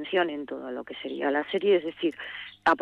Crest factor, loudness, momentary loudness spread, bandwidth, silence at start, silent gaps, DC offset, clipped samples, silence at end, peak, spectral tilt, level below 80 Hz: 16 dB; -29 LUFS; 12 LU; 8.4 kHz; 0 s; none; under 0.1%; under 0.1%; 0 s; -12 dBFS; -5.5 dB/octave; -68 dBFS